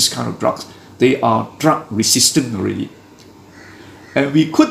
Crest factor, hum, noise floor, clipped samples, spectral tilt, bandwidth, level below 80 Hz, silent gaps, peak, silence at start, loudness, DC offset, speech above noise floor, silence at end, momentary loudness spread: 18 dB; none; -42 dBFS; under 0.1%; -3.5 dB/octave; 15.5 kHz; -56 dBFS; none; 0 dBFS; 0 s; -16 LUFS; under 0.1%; 27 dB; 0 s; 13 LU